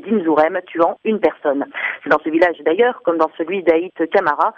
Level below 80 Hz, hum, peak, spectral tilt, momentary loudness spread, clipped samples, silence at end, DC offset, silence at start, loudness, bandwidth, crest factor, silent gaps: -58 dBFS; none; -2 dBFS; -7 dB/octave; 5 LU; under 0.1%; 0.05 s; under 0.1%; 0.05 s; -17 LUFS; 6.6 kHz; 14 dB; none